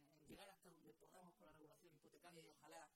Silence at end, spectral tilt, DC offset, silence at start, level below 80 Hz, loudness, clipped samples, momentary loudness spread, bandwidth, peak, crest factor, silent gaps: 0 s; -3.5 dB/octave; under 0.1%; 0 s; -88 dBFS; -67 LUFS; under 0.1%; 5 LU; 16 kHz; -50 dBFS; 18 dB; none